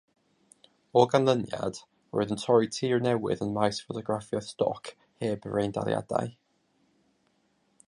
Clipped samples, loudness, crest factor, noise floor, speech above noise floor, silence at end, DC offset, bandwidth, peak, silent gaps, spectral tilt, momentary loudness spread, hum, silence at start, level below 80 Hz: under 0.1%; -28 LUFS; 22 dB; -71 dBFS; 43 dB; 1.55 s; under 0.1%; 11 kHz; -6 dBFS; none; -6 dB/octave; 11 LU; none; 0.95 s; -64 dBFS